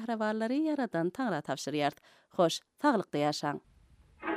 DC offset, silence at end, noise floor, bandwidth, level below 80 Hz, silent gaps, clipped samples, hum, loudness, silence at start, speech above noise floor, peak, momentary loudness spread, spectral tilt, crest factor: under 0.1%; 0 s; -61 dBFS; 15 kHz; -72 dBFS; none; under 0.1%; none; -32 LUFS; 0 s; 29 dB; -14 dBFS; 7 LU; -5 dB/octave; 20 dB